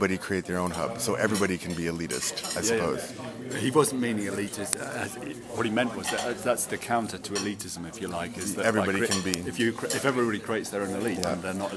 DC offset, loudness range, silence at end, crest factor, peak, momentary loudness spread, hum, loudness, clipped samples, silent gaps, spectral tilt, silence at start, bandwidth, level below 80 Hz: under 0.1%; 2 LU; 0 s; 26 dB; -2 dBFS; 8 LU; none; -28 LUFS; under 0.1%; none; -4 dB/octave; 0 s; 11 kHz; -60 dBFS